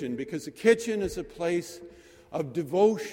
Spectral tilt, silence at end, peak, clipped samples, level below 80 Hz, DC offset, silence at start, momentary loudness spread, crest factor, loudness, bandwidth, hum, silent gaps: -5.5 dB/octave; 0 s; -8 dBFS; under 0.1%; -56 dBFS; under 0.1%; 0 s; 13 LU; 20 dB; -28 LUFS; 16.5 kHz; none; none